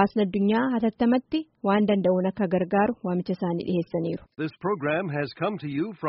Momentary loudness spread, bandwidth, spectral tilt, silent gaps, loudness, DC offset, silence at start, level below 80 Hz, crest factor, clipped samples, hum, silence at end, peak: 8 LU; 5.6 kHz; -6 dB/octave; none; -26 LUFS; under 0.1%; 0 s; -60 dBFS; 16 dB; under 0.1%; none; 0 s; -8 dBFS